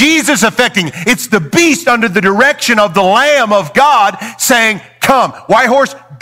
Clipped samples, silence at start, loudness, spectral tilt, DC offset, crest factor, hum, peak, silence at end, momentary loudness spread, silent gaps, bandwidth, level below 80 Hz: under 0.1%; 0 s; -10 LUFS; -3 dB/octave; 0.2%; 10 dB; none; 0 dBFS; 0.05 s; 4 LU; none; 17.5 kHz; -46 dBFS